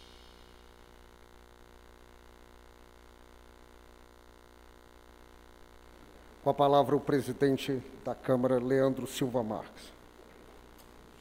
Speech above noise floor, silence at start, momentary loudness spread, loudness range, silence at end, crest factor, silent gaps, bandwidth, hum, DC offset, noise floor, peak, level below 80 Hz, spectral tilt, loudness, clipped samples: 27 dB; 0.15 s; 29 LU; 4 LU; 0.2 s; 22 dB; none; 16 kHz; 60 Hz at -60 dBFS; under 0.1%; -56 dBFS; -12 dBFS; -60 dBFS; -6.5 dB/octave; -30 LUFS; under 0.1%